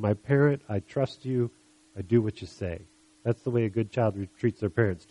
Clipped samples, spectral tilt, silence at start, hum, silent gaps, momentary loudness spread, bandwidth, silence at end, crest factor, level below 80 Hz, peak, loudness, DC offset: under 0.1%; -8.5 dB/octave; 0 s; none; none; 12 LU; 11 kHz; 0.15 s; 20 dB; -58 dBFS; -8 dBFS; -28 LUFS; under 0.1%